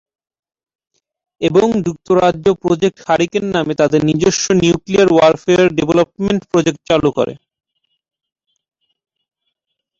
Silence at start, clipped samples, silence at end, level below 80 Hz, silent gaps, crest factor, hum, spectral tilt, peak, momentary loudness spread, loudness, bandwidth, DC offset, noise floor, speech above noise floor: 1.4 s; under 0.1%; 2.65 s; -46 dBFS; none; 14 dB; none; -5 dB/octave; -2 dBFS; 6 LU; -14 LUFS; 7.8 kHz; under 0.1%; -76 dBFS; 62 dB